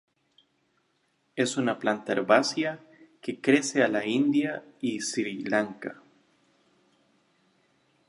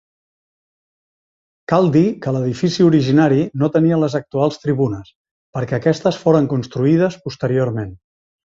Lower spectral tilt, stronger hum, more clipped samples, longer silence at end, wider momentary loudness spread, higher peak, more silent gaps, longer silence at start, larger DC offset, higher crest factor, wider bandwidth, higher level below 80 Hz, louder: second, -4 dB/octave vs -7.5 dB/octave; neither; neither; first, 2.15 s vs 0.5 s; first, 15 LU vs 10 LU; second, -6 dBFS vs -2 dBFS; second, none vs 5.15-5.25 s, 5.31-5.53 s; second, 1.35 s vs 1.7 s; neither; first, 24 dB vs 16 dB; first, 11.5 kHz vs 7.6 kHz; second, -80 dBFS vs -52 dBFS; second, -27 LUFS vs -17 LUFS